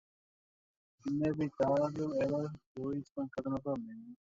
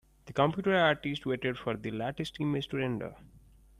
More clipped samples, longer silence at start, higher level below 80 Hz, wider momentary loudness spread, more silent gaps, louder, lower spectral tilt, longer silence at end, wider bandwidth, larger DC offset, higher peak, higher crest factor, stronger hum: neither; first, 1.05 s vs 0.25 s; second, -68 dBFS vs -60 dBFS; about the same, 11 LU vs 10 LU; first, 2.66-2.75 s, 3.11-3.15 s vs none; second, -36 LUFS vs -31 LUFS; first, -8 dB/octave vs -6.5 dB/octave; second, 0.15 s vs 0.4 s; second, 7.6 kHz vs 15 kHz; neither; second, -20 dBFS vs -12 dBFS; about the same, 18 dB vs 20 dB; neither